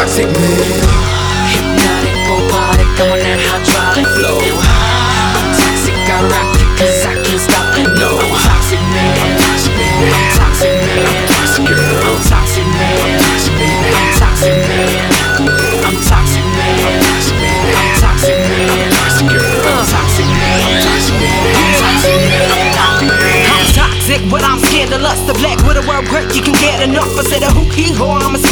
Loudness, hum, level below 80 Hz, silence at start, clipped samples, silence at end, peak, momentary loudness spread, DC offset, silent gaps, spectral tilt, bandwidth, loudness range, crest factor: -10 LUFS; none; -18 dBFS; 0 s; under 0.1%; 0 s; 0 dBFS; 3 LU; under 0.1%; none; -4 dB/octave; over 20 kHz; 2 LU; 10 dB